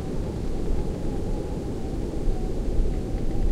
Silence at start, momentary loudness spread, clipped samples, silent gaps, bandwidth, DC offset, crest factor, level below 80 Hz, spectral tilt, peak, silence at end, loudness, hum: 0 s; 2 LU; under 0.1%; none; 10.5 kHz; under 0.1%; 16 dB; -28 dBFS; -8 dB/octave; -10 dBFS; 0 s; -30 LUFS; none